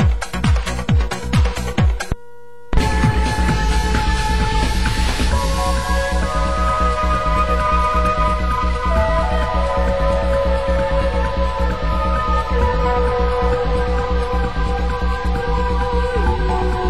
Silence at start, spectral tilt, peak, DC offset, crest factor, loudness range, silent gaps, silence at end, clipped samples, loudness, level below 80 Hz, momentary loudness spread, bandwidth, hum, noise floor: 0 s; -6 dB/octave; -4 dBFS; 3%; 14 dB; 2 LU; none; 0 s; under 0.1%; -19 LUFS; -20 dBFS; 3 LU; 12.5 kHz; none; -43 dBFS